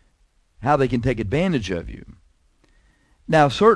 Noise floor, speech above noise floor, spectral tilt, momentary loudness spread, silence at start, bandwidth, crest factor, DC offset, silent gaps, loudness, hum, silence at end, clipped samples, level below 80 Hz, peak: -62 dBFS; 43 dB; -6.5 dB/octave; 20 LU; 0.6 s; 11 kHz; 20 dB; under 0.1%; none; -21 LUFS; none; 0 s; under 0.1%; -42 dBFS; -2 dBFS